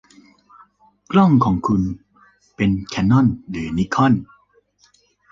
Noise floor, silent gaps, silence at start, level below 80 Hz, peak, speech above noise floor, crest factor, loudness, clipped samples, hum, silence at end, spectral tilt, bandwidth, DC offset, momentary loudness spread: -58 dBFS; none; 1.1 s; -42 dBFS; -2 dBFS; 42 dB; 18 dB; -18 LUFS; under 0.1%; 50 Hz at -40 dBFS; 1.1 s; -7.5 dB/octave; 7.6 kHz; under 0.1%; 11 LU